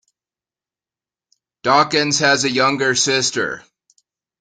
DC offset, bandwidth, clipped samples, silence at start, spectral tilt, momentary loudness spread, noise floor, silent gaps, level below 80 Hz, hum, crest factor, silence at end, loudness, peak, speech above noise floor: under 0.1%; 10 kHz; under 0.1%; 1.65 s; -2.5 dB/octave; 10 LU; under -90 dBFS; none; -62 dBFS; none; 20 dB; 0.8 s; -16 LUFS; -2 dBFS; over 73 dB